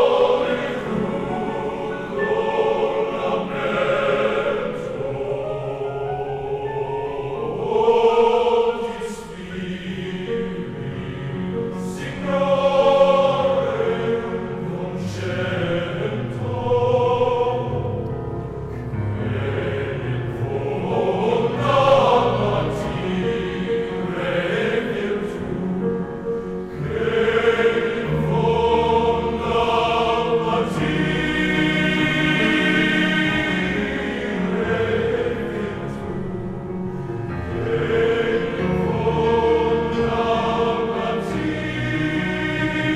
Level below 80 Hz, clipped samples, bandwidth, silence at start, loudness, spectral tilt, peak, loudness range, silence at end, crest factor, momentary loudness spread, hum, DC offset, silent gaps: -42 dBFS; under 0.1%; 11.5 kHz; 0 s; -21 LUFS; -6.5 dB/octave; -4 dBFS; 5 LU; 0 s; 18 dB; 11 LU; none; under 0.1%; none